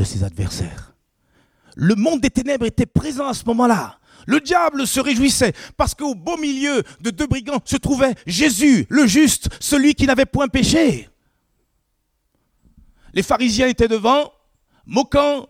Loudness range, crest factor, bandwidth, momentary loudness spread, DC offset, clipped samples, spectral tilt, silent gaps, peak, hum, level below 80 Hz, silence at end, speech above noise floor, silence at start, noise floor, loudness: 6 LU; 18 dB; 16 kHz; 9 LU; under 0.1%; under 0.1%; -4.5 dB/octave; none; 0 dBFS; none; -38 dBFS; 0.05 s; 52 dB; 0 s; -69 dBFS; -18 LUFS